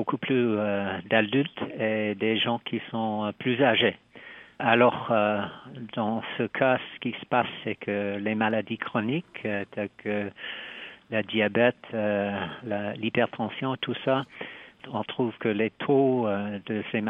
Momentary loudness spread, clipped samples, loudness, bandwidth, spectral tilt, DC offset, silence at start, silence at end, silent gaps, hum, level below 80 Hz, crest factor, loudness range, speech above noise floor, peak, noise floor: 13 LU; under 0.1%; -27 LUFS; 4 kHz; -8.5 dB/octave; under 0.1%; 0 s; 0 s; none; none; -70 dBFS; 20 dB; 4 LU; 21 dB; -6 dBFS; -47 dBFS